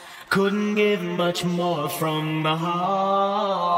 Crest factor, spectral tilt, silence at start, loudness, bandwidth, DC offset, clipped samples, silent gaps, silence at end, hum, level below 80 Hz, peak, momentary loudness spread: 16 dB; -5.5 dB/octave; 0 s; -23 LUFS; 16 kHz; under 0.1%; under 0.1%; none; 0 s; none; -64 dBFS; -8 dBFS; 3 LU